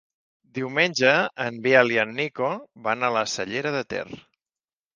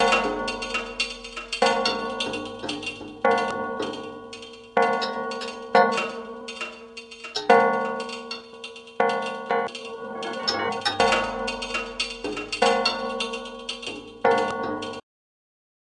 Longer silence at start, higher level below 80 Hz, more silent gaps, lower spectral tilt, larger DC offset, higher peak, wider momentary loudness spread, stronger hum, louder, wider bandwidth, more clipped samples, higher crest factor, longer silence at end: first, 0.55 s vs 0 s; second, -68 dBFS vs -54 dBFS; neither; about the same, -4 dB/octave vs -3 dB/octave; neither; about the same, -2 dBFS vs 0 dBFS; about the same, 14 LU vs 15 LU; neither; about the same, -23 LUFS vs -25 LUFS; second, 9.8 kHz vs 11.5 kHz; neither; about the same, 24 dB vs 26 dB; second, 0.75 s vs 1 s